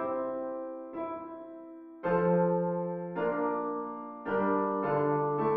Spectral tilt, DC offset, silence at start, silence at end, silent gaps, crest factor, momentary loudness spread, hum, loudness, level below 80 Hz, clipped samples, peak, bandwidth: -8 dB/octave; under 0.1%; 0 s; 0 s; none; 16 dB; 14 LU; none; -31 LUFS; -66 dBFS; under 0.1%; -16 dBFS; 4.6 kHz